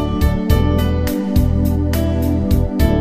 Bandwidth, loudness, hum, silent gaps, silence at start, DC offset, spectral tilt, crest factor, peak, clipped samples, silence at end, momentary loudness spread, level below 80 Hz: 15.5 kHz; -17 LUFS; none; none; 0 s; under 0.1%; -7.5 dB/octave; 14 dB; -2 dBFS; under 0.1%; 0 s; 2 LU; -20 dBFS